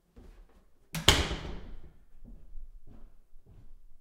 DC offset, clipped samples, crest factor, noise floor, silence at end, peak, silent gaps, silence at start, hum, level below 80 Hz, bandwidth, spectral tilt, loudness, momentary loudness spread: under 0.1%; under 0.1%; 34 dB; -59 dBFS; 0 s; -2 dBFS; none; 0.15 s; none; -44 dBFS; 16 kHz; -2.5 dB/octave; -28 LUFS; 28 LU